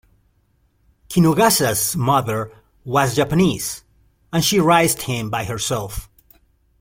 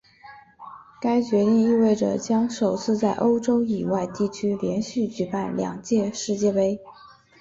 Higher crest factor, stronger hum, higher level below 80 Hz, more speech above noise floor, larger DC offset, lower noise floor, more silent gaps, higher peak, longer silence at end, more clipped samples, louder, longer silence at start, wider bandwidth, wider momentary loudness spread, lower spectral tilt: about the same, 18 dB vs 14 dB; neither; first, -44 dBFS vs -60 dBFS; first, 44 dB vs 25 dB; neither; first, -62 dBFS vs -48 dBFS; neither; first, -2 dBFS vs -10 dBFS; first, 0.75 s vs 0.35 s; neither; first, -18 LUFS vs -23 LUFS; first, 1.1 s vs 0.25 s; first, 16.5 kHz vs 7.8 kHz; first, 13 LU vs 8 LU; second, -4.5 dB/octave vs -6 dB/octave